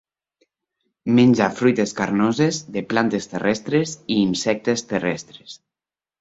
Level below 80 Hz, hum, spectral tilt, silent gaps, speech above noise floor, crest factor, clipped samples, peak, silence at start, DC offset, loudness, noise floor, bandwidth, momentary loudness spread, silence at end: -58 dBFS; none; -5.5 dB/octave; none; over 70 dB; 20 dB; under 0.1%; -2 dBFS; 1.05 s; under 0.1%; -20 LUFS; under -90 dBFS; 8 kHz; 12 LU; 0.65 s